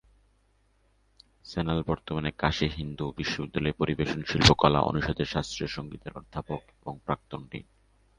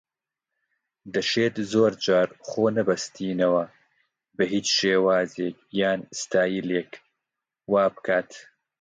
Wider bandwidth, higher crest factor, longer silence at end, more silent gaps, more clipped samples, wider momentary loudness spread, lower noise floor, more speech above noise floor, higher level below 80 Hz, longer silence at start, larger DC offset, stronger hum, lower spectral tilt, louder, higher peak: first, 10.5 kHz vs 9.4 kHz; first, 28 dB vs 18 dB; first, 0.6 s vs 0.4 s; neither; neither; first, 18 LU vs 9 LU; second, -67 dBFS vs -87 dBFS; second, 38 dB vs 63 dB; first, -44 dBFS vs -68 dBFS; first, 1.45 s vs 1.05 s; neither; neither; about the same, -5 dB/octave vs -4 dB/octave; second, -28 LUFS vs -24 LUFS; first, -2 dBFS vs -8 dBFS